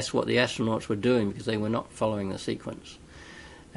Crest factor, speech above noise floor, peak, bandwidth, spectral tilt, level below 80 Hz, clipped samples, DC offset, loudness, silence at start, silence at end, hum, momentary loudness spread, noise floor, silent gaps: 22 dB; 20 dB; -8 dBFS; 11.5 kHz; -5.5 dB/octave; -56 dBFS; under 0.1%; under 0.1%; -28 LUFS; 0 s; 0.15 s; none; 21 LU; -47 dBFS; none